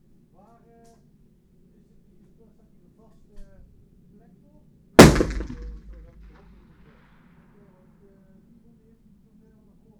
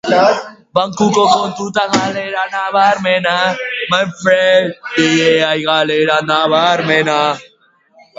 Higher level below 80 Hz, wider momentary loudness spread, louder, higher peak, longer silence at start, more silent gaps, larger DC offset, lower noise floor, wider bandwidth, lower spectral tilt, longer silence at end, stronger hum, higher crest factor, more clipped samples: first, -38 dBFS vs -58 dBFS; first, 30 LU vs 7 LU; second, -16 LUFS vs -13 LUFS; about the same, 0 dBFS vs 0 dBFS; first, 5 s vs 0.05 s; neither; neither; first, -57 dBFS vs -51 dBFS; first, over 20 kHz vs 8 kHz; about the same, -5 dB/octave vs -4 dB/octave; first, 4.3 s vs 0.75 s; neither; first, 26 dB vs 14 dB; neither